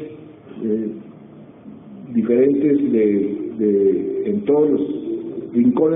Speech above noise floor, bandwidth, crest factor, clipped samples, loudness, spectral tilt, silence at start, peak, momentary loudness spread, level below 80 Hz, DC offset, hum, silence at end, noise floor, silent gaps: 24 dB; 3.8 kHz; 14 dB; under 0.1%; -19 LUFS; -7.5 dB/octave; 0 s; -6 dBFS; 15 LU; -60 dBFS; under 0.1%; none; 0 s; -41 dBFS; none